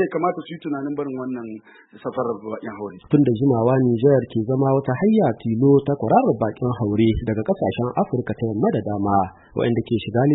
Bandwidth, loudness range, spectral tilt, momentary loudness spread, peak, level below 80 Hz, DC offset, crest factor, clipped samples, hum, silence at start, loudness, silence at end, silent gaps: 4.1 kHz; 5 LU; -13 dB/octave; 12 LU; -4 dBFS; -46 dBFS; under 0.1%; 16 dB; under 0.1%; none; 0 s; -21 LUFS; 0 s; none